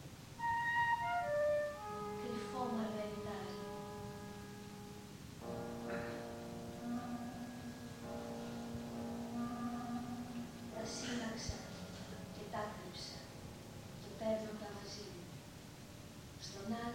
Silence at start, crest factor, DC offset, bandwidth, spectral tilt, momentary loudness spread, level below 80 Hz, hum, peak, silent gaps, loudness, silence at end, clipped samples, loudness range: 0 s; 18 dB; under 0.1%; 17 kHz; -5 dB/octave; 15 LU; -64 dBFS; none; -26 dBFS; none; -44 LUFS; 0 s; under 0.1%; 8 LU